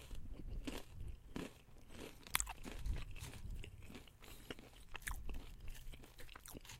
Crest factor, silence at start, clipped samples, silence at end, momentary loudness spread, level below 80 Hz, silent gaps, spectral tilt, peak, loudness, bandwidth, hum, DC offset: 36 dB; 0 s; under 0.1%; 0 s; 15 LU; -52 dBFS; none; -3 dB/octave; -12 dBFS; -50 LUFS; 16 kHz; none; under 0.1%